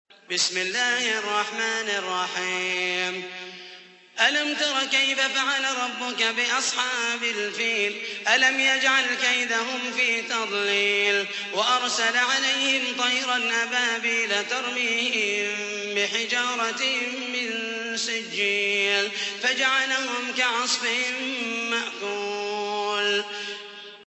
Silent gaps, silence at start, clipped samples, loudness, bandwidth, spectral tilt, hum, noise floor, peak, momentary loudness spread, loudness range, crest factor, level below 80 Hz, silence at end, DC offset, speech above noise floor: none; 0.3 s; under 0.1%; -23 LUFS; 8.4 kHz; 0 dB/octave; none; -47 dBFS; -6 dBFS; 7 LU; 4 LU; 20 dB; -80 dBFS; 0.05 s; under 0.1%; 22 dB